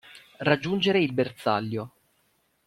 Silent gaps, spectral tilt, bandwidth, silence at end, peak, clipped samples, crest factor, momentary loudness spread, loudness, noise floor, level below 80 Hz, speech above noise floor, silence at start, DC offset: none; -6.5 dB/octave; 14.5 kHz; 0.8 s; -8 dBFS; under 0.1%; 20 dB; 11 LU; -26 LUFS; -69 dBFS; -64 dBFS; 44 dB; 0.05 s; under 0.1%